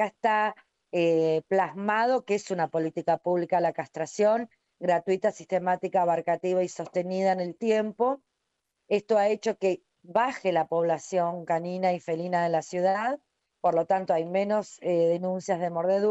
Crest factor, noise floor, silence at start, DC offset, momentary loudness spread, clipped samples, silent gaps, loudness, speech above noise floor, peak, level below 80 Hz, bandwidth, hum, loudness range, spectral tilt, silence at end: 14 dB; -80 dBFS; 0 s; under 0.1%; 5 LU; under 0.1%; none; -27 LUFS; 54 dB; -12 dBFS; -78 dBFS; 8.2 kHz; none; 1 LU; -6 dB/octave; 0 s